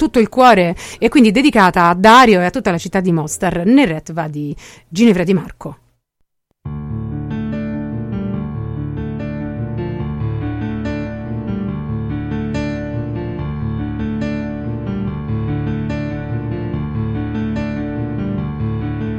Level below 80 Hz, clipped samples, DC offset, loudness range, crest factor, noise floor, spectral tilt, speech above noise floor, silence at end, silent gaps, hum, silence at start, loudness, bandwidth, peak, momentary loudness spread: -34 dBFS; under 0.1%; under 0.1%; 12 LU; 16 dB; -66 dBFS; -6 dB/octave; 53 dB; 0 s; none; none; 0 s; -17 LUFS; 15 kHz; 0 dBFS; 14 LU